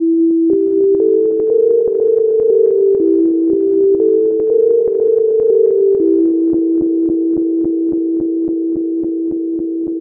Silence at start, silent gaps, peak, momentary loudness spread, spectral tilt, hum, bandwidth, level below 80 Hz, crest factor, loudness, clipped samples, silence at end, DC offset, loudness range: 0 s; none; -2 dBFS; 6 LU; -13.5 dB/octave; none; 1.3 kHz; -54 dBFS; 10 dB; -13 LUFS; under 0.1%; 0 s; under 0.1%; 3 LU